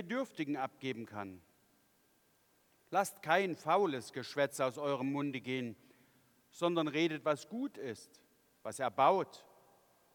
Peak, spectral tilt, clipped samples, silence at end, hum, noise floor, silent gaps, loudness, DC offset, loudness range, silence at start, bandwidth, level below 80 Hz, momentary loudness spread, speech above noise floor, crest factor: -14 dBFS; -5 dB/octave; under 0.1%; 0.75 s; none; -72 dBFS; none; -36 LUFS; under 0.1%; 4 LU; 0 s; 19 kHz; -86 dBFS; 14 LU; 37 dB; 22 dB